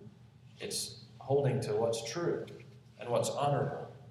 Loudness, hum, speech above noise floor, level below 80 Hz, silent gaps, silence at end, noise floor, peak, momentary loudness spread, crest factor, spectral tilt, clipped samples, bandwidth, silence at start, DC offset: -34 LUFS; none; 24 dB; -70 dBFS; none; 0 s; -57 dBFS; -18 dBFS; 15 LU; 16 dB; -5 dB/octave; under 0.1%; 14.5 kHz; 0 s; under 0.1%